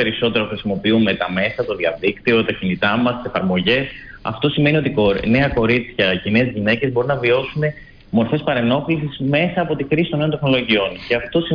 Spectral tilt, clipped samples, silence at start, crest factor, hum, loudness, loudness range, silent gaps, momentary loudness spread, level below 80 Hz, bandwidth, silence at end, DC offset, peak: -8.5 dB/octave; under 0.1%; 0 s; 14 dB; none; -18 LUFS; 2 LU; none; 6 LU; -42 dBFS; 5.2 kHz; 0 s; under 0.1%; -4 dBFS